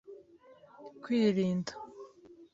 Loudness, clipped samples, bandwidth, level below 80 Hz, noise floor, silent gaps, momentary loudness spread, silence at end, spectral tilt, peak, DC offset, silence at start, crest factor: -31 LUFS; under 0.1%; 7.8 kHz; -74 dBFS; -59 dBFS; none; 25 LU; 0.1 s; -7 dB/octave; -16 dBFS; under 0.1%; 0.1 s; 18 dB